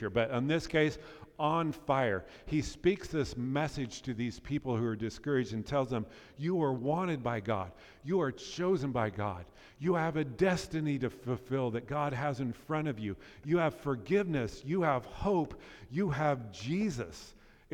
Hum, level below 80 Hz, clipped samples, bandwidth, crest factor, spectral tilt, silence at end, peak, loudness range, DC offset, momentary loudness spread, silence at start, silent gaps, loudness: none; -56 dBFS; under 0.1%; 15.5 kHz; 18 dB; -6.5 dB/octave; 0.45 s; -16 dBFS; 2 LU; under 0.1%; 8 LU; 0 s; none; -34 LUFS